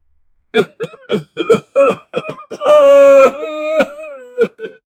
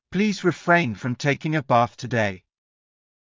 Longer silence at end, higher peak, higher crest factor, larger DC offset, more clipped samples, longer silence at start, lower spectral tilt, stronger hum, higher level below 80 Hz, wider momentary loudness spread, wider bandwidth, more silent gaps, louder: second, 0.3 s vs 0.95 s; first, 0 dBFS vs -4 dBFS; about the same, 14 dB vs 18 dB; neither; neither; first, 0.55 s vs 0.1 s; about the same, -5 dB/octave vs -6 dB/octave; neither; about the same, -58 dBFS vs -58 dBFS; first, 20 LU vs 7 LU; first, 13.5 kHz vs 7.6 kHz; neither; first, -12 LUFS vs -22 LUFS